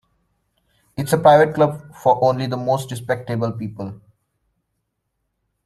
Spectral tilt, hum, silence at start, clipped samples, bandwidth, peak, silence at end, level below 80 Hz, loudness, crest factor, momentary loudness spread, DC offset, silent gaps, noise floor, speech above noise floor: -6.5 dB/octave; none; 1 s; under 0.1%; 14 kHz; -2 dBFS; 1.7 s; -58 dBFS; -19 LUFS; 20 dB; 17 LU; under 0.1%; none; -75 dBFS; 56 dB